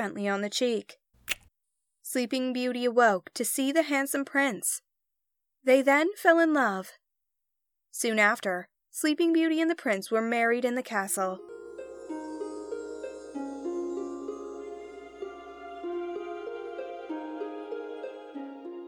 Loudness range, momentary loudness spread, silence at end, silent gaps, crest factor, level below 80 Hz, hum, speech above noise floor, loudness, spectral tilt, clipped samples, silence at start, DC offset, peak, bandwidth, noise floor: 12 LU; 18 LU; 0 s; none; 22 dB; -72 dBFS; none; 59 dB; -28 LUFS; -3 dB/octave; under 0.1%; 0 s; under 0.1%; -8 dBFS; 19 kHz; -86 dBFS